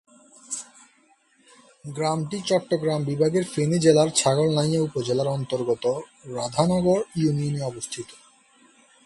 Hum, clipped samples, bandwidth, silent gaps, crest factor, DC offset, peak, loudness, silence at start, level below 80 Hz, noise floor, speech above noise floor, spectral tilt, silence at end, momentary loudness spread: none; under 0.1%; 11.5 kHz; none; 20 dB; under 0.1%; -4 dBFS; -24 LUFS; 0.5 s; -58 dBFS; -61 dBFS; 38 dB; -5.5 dB/octave; 0.9 s; 14 LU